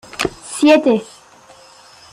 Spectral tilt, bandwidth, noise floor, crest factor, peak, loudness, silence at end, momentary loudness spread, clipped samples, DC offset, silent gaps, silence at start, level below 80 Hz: -4 dB/octave; 13.5 kHz; -45 dBFS; 16 dB; -2 dBFS; -15 LUFS; 1.1 s; 11 LU; under 0.1%; under 0.1%; none; 0.15 s; -50 dBFS